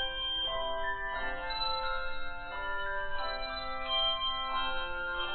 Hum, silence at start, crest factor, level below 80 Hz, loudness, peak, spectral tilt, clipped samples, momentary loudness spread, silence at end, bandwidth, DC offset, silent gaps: none; 0 s; 14 dB; -44 dBFS; -34 LUFS; -20 dBFS; -5.5 dB/octave; under 0.1%; 8 LU; 0 s; 4.4 kHz; under 0.1%; none